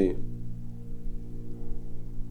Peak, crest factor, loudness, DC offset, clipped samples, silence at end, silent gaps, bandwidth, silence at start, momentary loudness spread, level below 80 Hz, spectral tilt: -10 dBFS; 18 dB; -39 LUFS; under 0.1%; under 0.1%; 0 s; none; 4.1 kHz; 0 s; 5 LU; -36 dBFS; -9.5 dB/octave